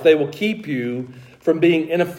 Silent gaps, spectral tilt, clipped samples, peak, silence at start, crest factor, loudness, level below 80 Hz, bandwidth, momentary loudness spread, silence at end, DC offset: none; -7 dB/octave; under 0.1%; -2 dBFS; 0 s; 16 dB; -20 LUFS; -66 dBFS; 16 kHz; 12 LU; 0 s; under 0.1%